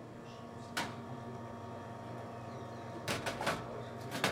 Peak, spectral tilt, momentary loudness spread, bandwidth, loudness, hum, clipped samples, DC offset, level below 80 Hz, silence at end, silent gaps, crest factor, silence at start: -16 dBFS; -4 dB/octave; 10 LU; 16 kHz; -42 LUFS; none; under 0.1%; under 0.1%; -68 dBFS; 0 s; none; 26 dB; 0 s